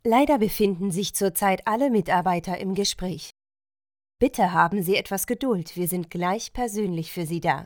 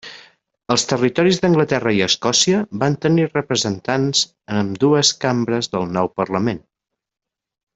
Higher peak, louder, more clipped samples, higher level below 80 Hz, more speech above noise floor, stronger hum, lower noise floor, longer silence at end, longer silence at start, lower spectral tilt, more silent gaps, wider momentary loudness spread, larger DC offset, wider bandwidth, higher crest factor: about the same, -4 dBFS vs -2 dBFS; second, -24 LUFS vs -18 LUFS; neither; first, -48 dBFS vs -56 dBFS; first, over 66 dB vs 28 dB; neither; first, under -90 dBFS vs -46 dBFS; second, 0 s vs 1.15 s; about the same, 0.05 s vs 0.05 s; about the same, -4.5 dB/octave vs -4 dB/octave; neither; about the same, 8 LU vs 7 LU; neither; first, over 20 kHz vs 8.4 kHz; about the same, 20 dB vs 18 dB